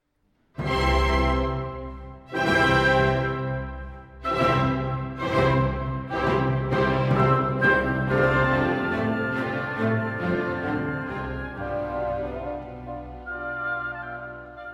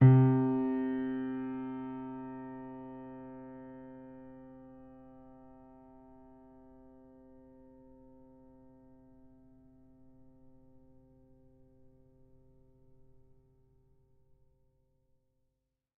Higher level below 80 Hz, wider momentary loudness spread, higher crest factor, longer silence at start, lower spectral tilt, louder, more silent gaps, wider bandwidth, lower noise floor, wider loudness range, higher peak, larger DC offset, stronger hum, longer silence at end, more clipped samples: first, -36 dBFS vs -66 dBFS; second, 15 LU vs 27 LU; second, 18 dB vs 24 dB; first, 0.55 s vs 0 s; second, -7 dB/octave vs -10.5 dB/octave; first, -24 LUFS vs -33 LUFS; neither; first, 11 kHz vs 3.3 kHz; second, -68 dBFS vs -84 dBFS; second, 8 LU vs 25 LU; first, -8 dBFS vs -12 dBFS; neither; neither; second, 0 s vs 11.15 s; neither